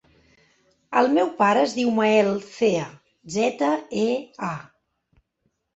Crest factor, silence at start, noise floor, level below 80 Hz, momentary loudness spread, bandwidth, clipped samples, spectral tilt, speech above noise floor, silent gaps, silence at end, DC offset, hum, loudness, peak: 20 dB; 0.9 s; -73 dBFS; -66 dBFS; 12 LU; 8.2 kHz; under 0.1%; -5 dB/octave; 52 dB; none; 1.15 s; under 0.1%; none; -22 LUFS; -4 dBFS